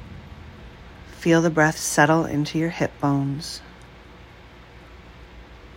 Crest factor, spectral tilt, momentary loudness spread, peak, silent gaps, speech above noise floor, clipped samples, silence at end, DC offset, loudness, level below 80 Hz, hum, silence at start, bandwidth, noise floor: 22 dB; -5 dB/octave; 25 LU; -2 dBFS; none; 25 dB; under 0.1%; 0 s; under 0.1%; -21 LUFS; -48 dBFS; none; 0 s; 16 kHz; -46 dBFS